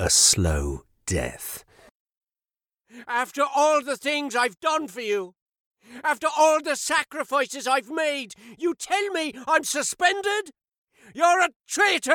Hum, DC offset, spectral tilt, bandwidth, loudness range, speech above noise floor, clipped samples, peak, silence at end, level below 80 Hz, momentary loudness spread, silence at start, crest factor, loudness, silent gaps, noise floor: none; under 0.1%; -2.5 dB/octave; 19 kHz; 3 LU; over 66 dB; under 0.1%; -4 dBFS; 0 s; -44 dBFS; 12 LU; 0 s; 20 dB; -23 LUFS; 1.91-2.05 s, 2.17-2.21 s, 5.42-5.46 s, 5.60-5.71 s, 10.78-10.85 s, 11.56-11.60 s; under -90 dBFS